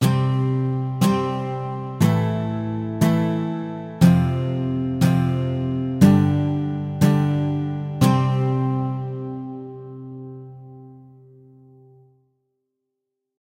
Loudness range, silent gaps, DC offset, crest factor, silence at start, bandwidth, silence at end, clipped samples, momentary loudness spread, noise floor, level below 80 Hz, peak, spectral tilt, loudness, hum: 13 LU; none; under 0.1%; 20 dB; 0 s; 16 kHz; 2.4 s; under 0.1%; 18 LU; -80 dBFS; -50 dBFS; 0 dBFS; -7.5 dB/octave; -21 LUFS; none